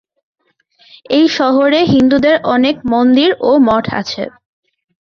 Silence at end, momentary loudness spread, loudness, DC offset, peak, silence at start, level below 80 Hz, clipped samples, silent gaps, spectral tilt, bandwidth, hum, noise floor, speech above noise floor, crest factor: 0.75 s; 9 LU; -12 LUFS; under 0.1%; -2 dBFS; 1.1 s; -48 dBFS; under 0.1%; none; -6 dB/octave; 7 kHz; none; -52 dBFS; 41 dB; 12 dB